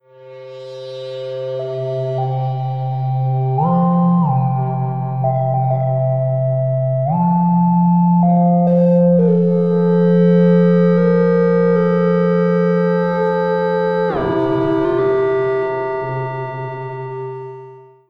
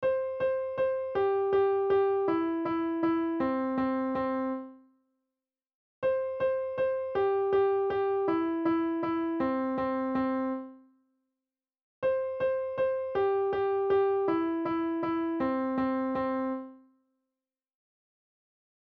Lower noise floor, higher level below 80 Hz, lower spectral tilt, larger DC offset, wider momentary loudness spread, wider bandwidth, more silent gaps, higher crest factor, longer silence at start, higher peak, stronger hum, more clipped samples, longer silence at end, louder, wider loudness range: second, -39 dBFS vs under -90 dBFS; first, -54 dBFS vs -64 dBFS; first, -10.5 dB/octave vs -8.5 dB/octave; neither; first, 14 LU vs 5 LU; about the same, 5 kHz vs 5 kHz; second, none vs 5.74-6.02 s, 11.82-12.02 s; about the same, 12 dB vs 12 dB; first, 0.2 s vs 0 s; first, -2 dBFS vs -18 dBFS; neither; neither; second, 0.25 s vs 2.2 s; first, -16 LUFS vs -29 LUFS; about the same, 6 LU vs 5 LU